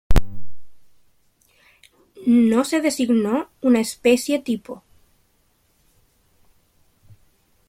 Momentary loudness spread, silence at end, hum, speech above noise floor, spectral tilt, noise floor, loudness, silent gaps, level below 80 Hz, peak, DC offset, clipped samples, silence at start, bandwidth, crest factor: 12 LU; 2.95 s; none; 44 dB; -5.5 dB/octave; -63 dBFS; -20 LUFS; none; -32 dBFS; -2 dBFS; under 0.1%; under 0.1%; 0.1 s; 16 kHz; 18 dB